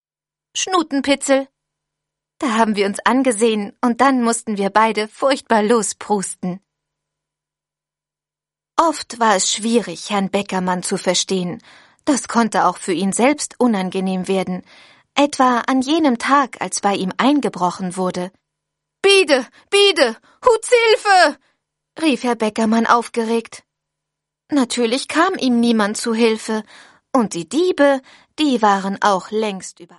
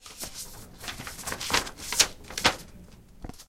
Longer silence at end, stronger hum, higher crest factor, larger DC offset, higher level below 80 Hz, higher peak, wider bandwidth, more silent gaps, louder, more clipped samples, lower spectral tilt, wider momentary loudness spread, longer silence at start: first, 0.15 s vs 0 s; neither; second, 18 dB vs 30 dB; neither; second, -62 dBFS vs -48 dBFS; about the same, 0 dBFS vs -2 dBFS; second, 11.5 kHz vs 16.5 kHz; neither; first, -17 LUFS vs -28 LUFS; neither; first, -3.5 dB/octave vs -0.5 dB/octave; second, 9 LU vs 19 LU; first, 0.55 s vs 0 s